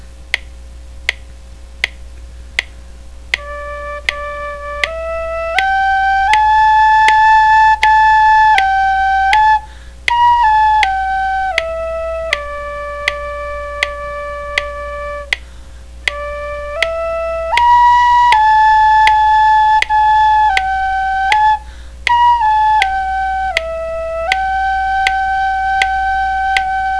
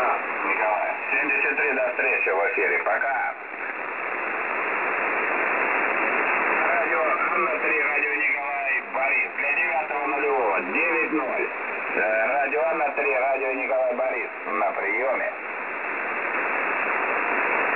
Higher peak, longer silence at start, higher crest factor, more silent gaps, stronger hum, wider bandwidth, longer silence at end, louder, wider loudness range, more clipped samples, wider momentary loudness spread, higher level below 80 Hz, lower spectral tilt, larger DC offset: first, 0 dBFS vs -10 dBFS; about the same, 0 s vs 0 s; about the same, 14 dB vs 14 dB; neither; neither; first, 11 kHz vs 4 kHz; about the same, 0 s vs 0 s; first, -13 LUFS vs -23 LUFS; first, 12 LU vs 3 LU; neither; first, 13 LU vs 6 LU; first, -32 dBFS vs -76 dBFS; second, -2 dB/octave vs -6.5 dB/octave; first, 0.8% vs 0.1%